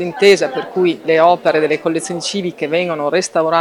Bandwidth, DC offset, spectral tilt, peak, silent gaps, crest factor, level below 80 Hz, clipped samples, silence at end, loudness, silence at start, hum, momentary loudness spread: 13.5 kHz; under 0.1%; -4 dB/octave; 0 dBFS; none; 14 dB; -64 dBFS; under 0.1%; 0 s; -15 LUFS; 0 s; none; 8 LU